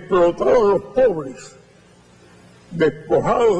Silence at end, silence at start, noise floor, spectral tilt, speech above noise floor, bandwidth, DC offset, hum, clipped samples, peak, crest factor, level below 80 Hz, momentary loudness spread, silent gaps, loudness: 0 s; 0 s; -50 dBFS; -6.5 dB/octave; 33 dB; 9.8 kHz; under 0.1%; none; under 0.1%; -6 dBFS; 12 dB; -46 dBFS; 18 LU; none; -18 LUFS